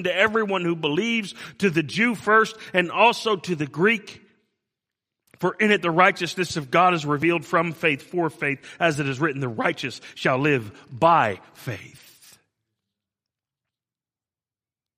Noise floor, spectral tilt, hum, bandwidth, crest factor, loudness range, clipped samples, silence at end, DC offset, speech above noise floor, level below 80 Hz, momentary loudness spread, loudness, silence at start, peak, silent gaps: under -90 dBFS; -5 dB/octave; none; 15.5 kHz; 22 dB; 5 LU; under 0.1%; 3.1 s; under 0.1%; over 68 dB; -66 dBFS; 10 LU; -22 LUFS; 0 s; -2 dBFS; none